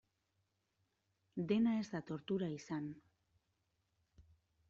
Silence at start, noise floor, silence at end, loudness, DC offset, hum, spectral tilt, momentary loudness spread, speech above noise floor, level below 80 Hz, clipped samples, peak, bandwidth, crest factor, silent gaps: 1.35 s; -84 dBFS; 0.5 s; -40 LUFS; under 0.1%; none; -6.5 dB/octave; 15 LU; 45 dB; -78 dBFS; under 0.1%; -24 dBFS; 7.6 kHz; 20 dB; none